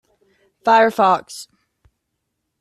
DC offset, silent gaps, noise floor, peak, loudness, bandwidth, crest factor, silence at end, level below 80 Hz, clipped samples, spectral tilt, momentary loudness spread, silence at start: under 0.1%; none; -75 dBFS; -2 dBFS; -16 LUFS; 14 kHz; 18 dB; 1.2 s; -64 dBFS; under 0.1%; -4 dB/octave; 21 LU; 0.65 s